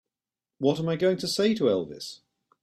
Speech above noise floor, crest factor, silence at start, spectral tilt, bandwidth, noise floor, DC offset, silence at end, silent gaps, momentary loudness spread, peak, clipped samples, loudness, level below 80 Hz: over 65 dB; 16 dB; 0.6 s; -5.5 dB/octave; 14.5 kHz; under -90 dBFS; under 0.1%; 0.45 s; none; 14 LU; -10 dBFS; under 0.1%; -26 LUFS; -68 dBFS